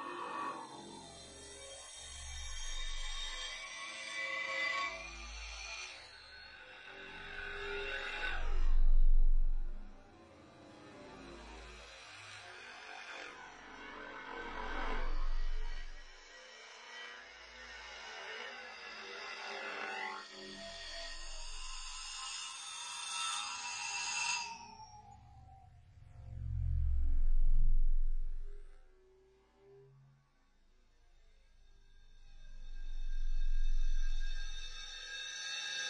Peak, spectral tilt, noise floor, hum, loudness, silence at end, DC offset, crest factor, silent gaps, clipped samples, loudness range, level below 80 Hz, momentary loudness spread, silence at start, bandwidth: -18 dBFS; -2.5 dB/octave; -69 dBFS; none; -42 LUFS; 0 s; under 0.1%; 16 dB; none; under 0.1%; 10 LU; -36 dBFS; 18 LU; 0 s; 10.5 kHz